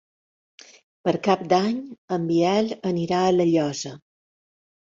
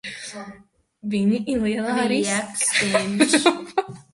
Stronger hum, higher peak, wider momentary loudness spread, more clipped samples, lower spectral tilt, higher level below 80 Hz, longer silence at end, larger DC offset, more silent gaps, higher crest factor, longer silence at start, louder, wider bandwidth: neither; second, -6 dBFS vs -2 dBFS; second, 10 LU vs 16 LU; neither; first, -6 dB/octave vs -3.5 dB/octave; second, -64 dBFS vs -56 dBFS; first, 1 s vs 0.1 s; neither; first, 1.98-2.08 s vs none; about the same, 18 dB vs 20 dB; first, 1.05 s vs 0.05 s; about the same, -23 LUFS vs -21 LUFS; second, 7.6 kHz vs 11.5 kHz